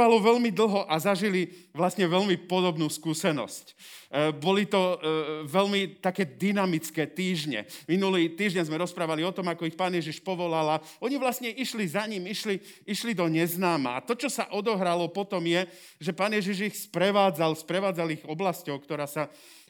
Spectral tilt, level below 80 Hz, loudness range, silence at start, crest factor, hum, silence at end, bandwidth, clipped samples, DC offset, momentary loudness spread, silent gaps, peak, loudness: -5 dB/octave; -82 dBFS; 2 LU; 0 s; 20 dB; none; 0.4 s; over 20 kHz; under 0.1%; under 0.1%; 8 LU; none; -8 dBFS; -28 LUFS